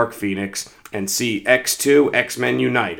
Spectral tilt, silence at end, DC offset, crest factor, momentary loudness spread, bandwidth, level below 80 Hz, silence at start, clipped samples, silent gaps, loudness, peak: -3.5 dB/octave; 0 s; under 0.1%; 20 dB; 12 LU; over 20 kHz; -60 dBFS; 0 s; under 0.1%; none; -18 LUFS; 0 dBFS